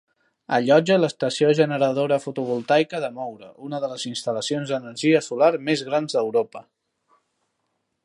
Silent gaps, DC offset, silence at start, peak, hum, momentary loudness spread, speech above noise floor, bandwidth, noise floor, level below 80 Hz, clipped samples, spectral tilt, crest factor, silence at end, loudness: none; under 0.1%; 0.5 s; -4 dBFS; none; 12 LU; 53 dB; 11.5 kHz; -75 dBFS; -74 dBFS; under 0.1%; -5 dB/octave; 18 dB; 1.45 s; -22 LUFS